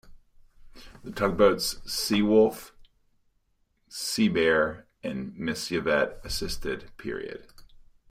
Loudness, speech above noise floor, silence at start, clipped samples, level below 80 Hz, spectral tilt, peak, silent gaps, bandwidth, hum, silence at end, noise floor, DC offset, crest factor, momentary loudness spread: -26 LUFS; 45 dB; 0.05 s; under 0.1%; -48 dBFS; -4 dB/octave; -8 dBFS; none; 16 kHz; none; 0.35 s; -71 dBFS; under 0.1%; 20 dB; 17 LU